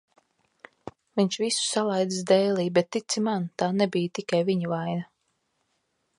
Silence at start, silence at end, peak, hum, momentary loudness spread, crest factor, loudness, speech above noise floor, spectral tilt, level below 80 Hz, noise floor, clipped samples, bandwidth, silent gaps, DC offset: 0.85 s; 1.15 s; -8 dBFS; none; 11 LU; 18 dB; -26 LUFS; 50 dB; -4.5 dB/octave; -72 dBFS; -75 dBFS; under 0.1%; 11.5 kHz; none; under 0.1%